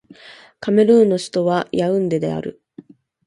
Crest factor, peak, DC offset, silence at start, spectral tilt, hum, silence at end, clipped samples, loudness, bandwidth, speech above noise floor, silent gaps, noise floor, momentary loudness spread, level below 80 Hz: 16 dB; -2 dBFS; under 0.1%; 0.25 s; -6.5 dB/octave; none; 0.75 s; under 0.1%; -17 LUFS; 11.5 kHz; 28 dB; none; -44 dBFS; 14 LU; -60 dBFS